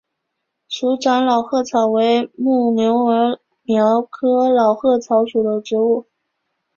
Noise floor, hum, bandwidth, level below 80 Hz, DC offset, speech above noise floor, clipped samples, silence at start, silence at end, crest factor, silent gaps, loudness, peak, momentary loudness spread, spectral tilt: -76 dBFS; none; 7.2 kHz; -64 dBFS; under 0.1%; 60 dB; under 0.1%; 0.7 s; 0.75 s; 14 dB; none; -17 LUFS; -2 dBFS; 6 LU; -5.5 dB/octave